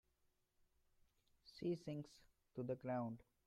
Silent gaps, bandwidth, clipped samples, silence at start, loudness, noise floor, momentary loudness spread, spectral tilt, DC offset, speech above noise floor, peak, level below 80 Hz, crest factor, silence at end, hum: none; 13.5 kHz; under 0.1%; 1.45 s; -48 LUFS; -83 dBFS; 13 LU; -8 dB/octave; under 0.1%; 36 dB; -32 dBFS; -80 dBFS; 18 dB; 0.3 s; none